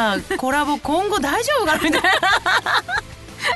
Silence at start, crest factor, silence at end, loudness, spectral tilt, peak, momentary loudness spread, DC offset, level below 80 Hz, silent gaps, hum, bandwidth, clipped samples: 0 s; 16 dB; 0 s; -18 LUFS; -2.5 dB/octave; -4 dBFS; 9 LU; under 0.1%; -44 dBFS; none; none; 12.5 kHz; under 0.1%